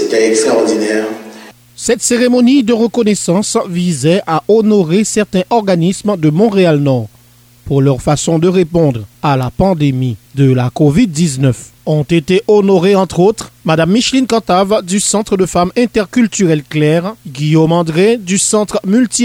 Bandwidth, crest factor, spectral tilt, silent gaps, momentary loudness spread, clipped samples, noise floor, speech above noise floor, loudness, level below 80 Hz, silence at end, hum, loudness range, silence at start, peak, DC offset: 16.5 kHz; 10 dB; -5.5 dB/octave; none; 6 LU; under 0.1%; -44 dBFS; 33 dB; -12 LUFS; -40 dBFS; 0 s; none; 2 LU; 0 s; 0 dBFS; under 0.1%